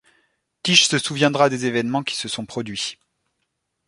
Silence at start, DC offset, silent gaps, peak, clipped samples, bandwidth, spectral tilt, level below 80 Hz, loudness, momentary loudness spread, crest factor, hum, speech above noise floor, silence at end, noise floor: 0.65 s; under 0.1%; none; 0 dBFS; under 0.1%; 11.5 kHz; -3 dB/octave; -62 dBFS; -20 LUFS; 13 LU; 22 dB; none; 55 dB; 0.95 s; -75 dBFS